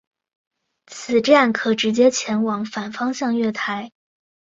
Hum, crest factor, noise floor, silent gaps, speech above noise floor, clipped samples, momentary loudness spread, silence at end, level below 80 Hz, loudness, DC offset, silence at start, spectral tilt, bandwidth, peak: none; 20 dB; -42 dBFS; none; 23 dB; under 0.1%; 14 LU; 0.6 s; -66 dBFS; -19 LUFS; under 0.1%; 0.9 s; -4 dB/octave; 7.8 kHz; 0 dBFS